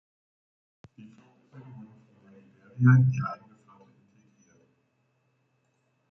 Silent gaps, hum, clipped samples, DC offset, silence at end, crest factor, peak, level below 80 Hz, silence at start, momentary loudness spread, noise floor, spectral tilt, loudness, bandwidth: none; none; under 0.1%; under 0.1%; 2.75 s; 22 dB; -8 dBFS; -66 dBFS; 1.55 s; 29 LU; -73 dBFS; -9.5 dB/octave; -23 LUFS; 6.4 kHz